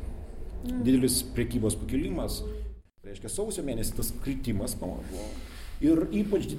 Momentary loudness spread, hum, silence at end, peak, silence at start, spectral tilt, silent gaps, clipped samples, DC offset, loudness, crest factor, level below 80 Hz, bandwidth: 18 LU; none; 0 s; -14 dBFS; 0 s; -5 dB/octave; none; under 0.1%; under 0.1%; -30 LUFS; 16 dB; -38 dBFS; 16.5 kHz